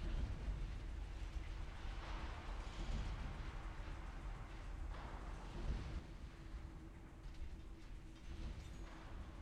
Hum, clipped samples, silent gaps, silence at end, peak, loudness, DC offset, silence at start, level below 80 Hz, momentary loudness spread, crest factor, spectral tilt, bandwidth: none; under 0.1%; none; 0 s; -32 dBFS; -51 LUFS; under 0.1%; 0 s; -48 dBFS; 9 LU; 16 dB; -6 dB/octave; 10.5 kHz